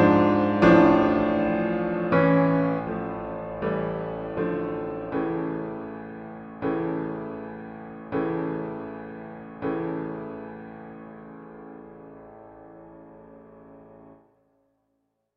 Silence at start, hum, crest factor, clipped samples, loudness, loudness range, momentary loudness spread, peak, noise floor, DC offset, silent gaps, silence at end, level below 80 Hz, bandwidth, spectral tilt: 0 s; none; 22 dB; under 0.1%; -25 LUFS; 23 LU; 24 LU; -4 dBFS; -75 dBFS; under 0.1%; none; 1.25 s; -52 dBFS; 6.4 kHz; -9 dB/octave